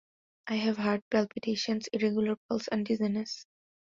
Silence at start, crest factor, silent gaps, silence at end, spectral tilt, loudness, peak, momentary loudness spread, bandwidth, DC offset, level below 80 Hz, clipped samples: 0.45 s; 18 dB; 1.02-1.11 s, 2.37-2.49 s; 0.45 s; -5.5 dB/octave; -31 LUFS; -14 dBFS; 6 LU; 7.6 kHz; under 0.1%; -70 dBFS; under 0.1%